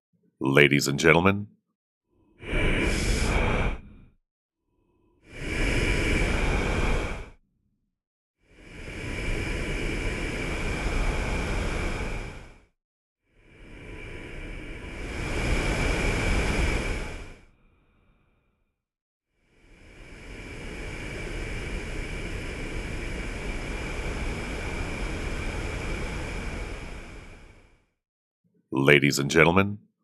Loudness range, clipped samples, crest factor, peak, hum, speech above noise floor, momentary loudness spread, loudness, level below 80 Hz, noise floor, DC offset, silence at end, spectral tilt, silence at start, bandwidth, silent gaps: 13 LU; under 0.1%; 28 dB; 0 dBFS; none; 54 dB; 21 LU; -27 LUFS; -34 dBFS; -76 dBFS; under 0.1%; 0.25 s; -5 dB/octave; 0.4 s; 15.5 kHz; 1.75-2.01 s, 4.31-4.49 s, 8.07-8.34 s, 12.84-13.16 s, 19.01-19.20 s, 28.09-28.44 s